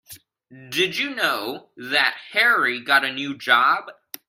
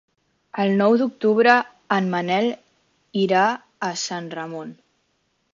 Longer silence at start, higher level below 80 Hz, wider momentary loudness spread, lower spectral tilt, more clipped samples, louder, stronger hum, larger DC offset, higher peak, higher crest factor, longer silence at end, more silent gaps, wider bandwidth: second, 0.1 s vs 0.55 s; about the same, -72 dBFS vs -70 dBFS; second, 11 LU vs 16 LU; second, -2 dB/octave vs -5 dB/octave; neither; about the same, -20 LUFS vs -21 LUFS; neither; neither; about the same, -2 dBFS vs -2 dBFS; about the same, 20 dB vs 20 dB; second, 0.35 s vs 0.8 s; neither; first, 16 kHz vs 7.6 kHz